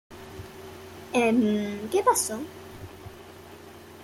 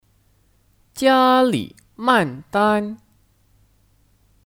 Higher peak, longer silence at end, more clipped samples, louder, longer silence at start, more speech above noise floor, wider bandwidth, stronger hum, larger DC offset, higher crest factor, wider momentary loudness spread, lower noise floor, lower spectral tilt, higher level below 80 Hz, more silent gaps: second, -8 dBFS vs -2 dBFS; second, 0 s vs 1.55 s; neither; second, -25 LUFS vs -18 LUFS; second, 0.1 s vs 0.95 s; second, 22 dB vs 42 dB; about the same, 16.5 kHz vs 17 kHz; neither; neither; about the same, 20 dB vs 20 dB; about the same, 23 LU vs 21 LU; second, -46 dBFS vs -59 dBFS; about the same, -4 dB/octave vs -5 dB/octave; about the same, -60 dBFS vs -58 dBFS; neither